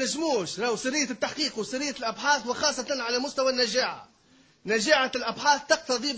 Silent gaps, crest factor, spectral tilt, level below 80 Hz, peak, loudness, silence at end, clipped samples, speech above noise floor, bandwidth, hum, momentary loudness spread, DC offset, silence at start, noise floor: none; 20 dB; -1.5 dB/octave; -64 dBFS; -6 dBFS; -26 LUFS; 0 s; under 0.1%; 33 dB; 8 kHz; none; 7 LU; under 0.1%; 0 s; -60 dBFS